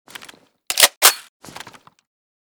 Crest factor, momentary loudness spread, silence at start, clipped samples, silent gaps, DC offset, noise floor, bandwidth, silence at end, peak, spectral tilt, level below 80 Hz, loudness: 22 dB; 26 LU; 0.7 s; under 0.1%; 0.97-1.01 s; under 0.1%; -46 dBFS; over 20 kHz; 1.25 s; 0 dBFS; 2.5 dB/octave; -66 dBFS; -13 LUFS